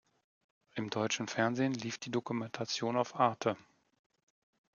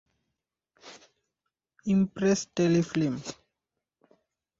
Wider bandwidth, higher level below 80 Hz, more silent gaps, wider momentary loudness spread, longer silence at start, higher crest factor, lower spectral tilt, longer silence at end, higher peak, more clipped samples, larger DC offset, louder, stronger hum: about the same, 7.4 kHz vs 7.8 kHz; second, -80 dBFS vs -64 dBFS; neither; second, 8 LU vs 18 LU; about the same, 0.75 s vs 0.85 s; about the same, 22 dB vs 18 dB; second, -4.5 dB/octave vs -6 dB/octave; about the same, 1.15 s vs 1.25 s; about the same, -14 dBFS vs -12 dBFS; neither; neither; second, -35 LUFS vs -27 LUFS; neither